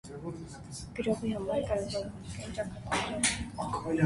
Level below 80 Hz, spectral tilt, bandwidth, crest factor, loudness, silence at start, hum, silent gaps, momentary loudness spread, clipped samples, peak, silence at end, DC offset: -50 dBFS; -4 dB/octave; 11.5 kHz; 20 dB; -34 LUFS; 0.05 s; none; none; 13 LU; under 0.1%; -12 dBFS; 0 s; under 0.1%